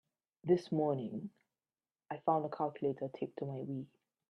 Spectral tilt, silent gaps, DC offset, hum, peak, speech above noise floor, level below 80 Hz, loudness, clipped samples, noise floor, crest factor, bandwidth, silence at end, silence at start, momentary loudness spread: -9 dB/octave; none; under 0.1%; none; -18 dBFS; over 54 dB; -80 dBFS; -37 LUFS; under 0.1%; under -90 dBFS; 20 dB; 9.4 kHz; 0.45 s; 0.45 s; 13 LU